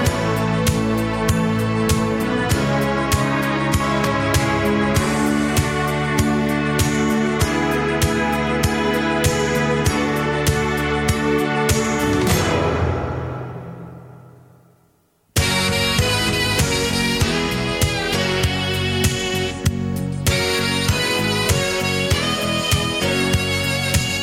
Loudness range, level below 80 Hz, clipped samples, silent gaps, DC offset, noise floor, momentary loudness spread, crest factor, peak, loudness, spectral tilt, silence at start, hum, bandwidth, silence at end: 3 LU; -32 dBFS; under 0.1%; none; under 0.1%; -60 dBFS; 3 LU; 16 dB; -4 dBFS; -19 LUFS; -4.5 dB/octave; 0 s; none; 17.5 kHz; 0 s